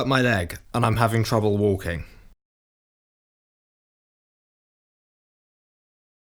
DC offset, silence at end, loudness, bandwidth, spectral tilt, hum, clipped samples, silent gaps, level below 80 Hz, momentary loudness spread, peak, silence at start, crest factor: under 0.1%; 4.2 s; -23 LUFS; over 20 kHz; -6 dB/octave; none; under 0.1%; none; -46 dBFS; 9 LU; -2 dBFS; 0 s; 24 dB